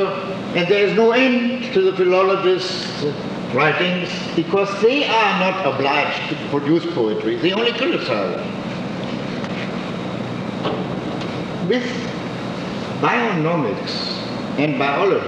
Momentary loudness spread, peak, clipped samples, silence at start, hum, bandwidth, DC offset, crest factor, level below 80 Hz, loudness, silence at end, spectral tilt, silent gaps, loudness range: 10 LU; -4 dBFS; under 0.1%; 0 s; none; 9.6 kHz; under 0.1%; 16 dB; -54 dBFS; -19 LUFS; 0 s; -6 dB/octave; none; 7 LU